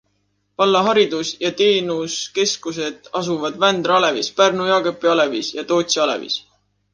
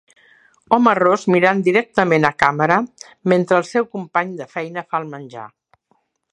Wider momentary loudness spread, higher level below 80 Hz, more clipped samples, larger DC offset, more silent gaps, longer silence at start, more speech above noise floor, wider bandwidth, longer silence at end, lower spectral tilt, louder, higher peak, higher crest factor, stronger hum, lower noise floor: second, 10 LU vs 13 LU; second, -64 dBFS vs -58 dBFS; neither; neither; neither; about the same, 0.6 s vs 0.7 s; about the same, 49 dB vs 47 dB; about the same, 10.5 kHz vs 11 kHz; second, 0.55 s vs 0.85 s; second, -3 dB/octave vs -6.5 dB/octave; about the same, -18 LUFS vs -17 LUFS; about the same, -2 dBFS vs 0 dBFS; about the same, 18 dB vs 18 dB; first, 50 Hz at -50 dBFS vs none; about the same, -67 dBFS vs -65 dBFS